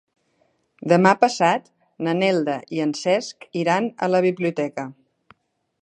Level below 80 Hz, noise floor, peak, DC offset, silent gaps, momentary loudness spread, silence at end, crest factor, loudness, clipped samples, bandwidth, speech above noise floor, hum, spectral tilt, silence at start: -72 dBFS; -66 dBFS; 0 dBFS; under 0.1%; none; 12 LU; 0.9 s; 22 dB; -21 LUFS; under 0.1%; 10 kHz; 46 dB; none; -5.5 dB/octave; 0.85 s